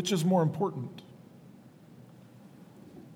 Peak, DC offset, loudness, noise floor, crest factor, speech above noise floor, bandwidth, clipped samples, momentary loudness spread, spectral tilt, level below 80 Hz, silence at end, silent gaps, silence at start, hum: -14 dBFS; under 0.1%; -29 LUFS; -54 dBFS; 20 dB; 25 dB; 16 kHz; under 0.1%; 27 LU; -6 dB/octave; -76 dBFS; 0 s; none; 0 s; none